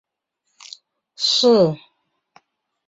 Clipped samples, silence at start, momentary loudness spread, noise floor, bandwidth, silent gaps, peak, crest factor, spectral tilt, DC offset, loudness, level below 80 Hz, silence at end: under 0.1%; 1.2 s; 26 LU; -75 dBFS; 8 kHz; none; -4 dBFS; 18 dB; -4.5 dB/octave; under 0.1%; -16 LUFS; -66 dBFS; 1.1 s